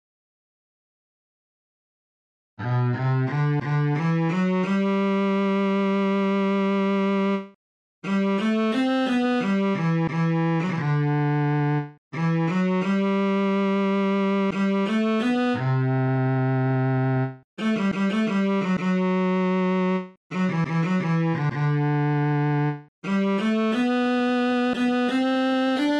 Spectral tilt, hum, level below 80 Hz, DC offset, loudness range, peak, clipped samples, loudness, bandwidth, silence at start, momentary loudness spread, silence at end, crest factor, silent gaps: -8 dB/octave; none; -64 dBFS; under 0.1%; 1 LU; -12 dBFS; under 0.1%; -23 LUFS; 8.6 kHz; 2.6 s; 3 LU; 0 s; 10 dB; 7.55-8.02 s, 11.98-12.11 s, 17.44-17.57 s, 20.17-20.30 s, 22.88-23.02 s